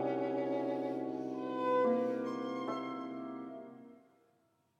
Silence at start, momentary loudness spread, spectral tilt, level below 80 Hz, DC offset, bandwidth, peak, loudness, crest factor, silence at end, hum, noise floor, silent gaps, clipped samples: 0 s; 15 LU; -7 dB/octave; under -90 dBFS; under 0.1%; 7.8 kHz; -22 dBFS; -36 LUFS; 16 dB; 0.85 s; none; -74 dBFS; none; under 0.1%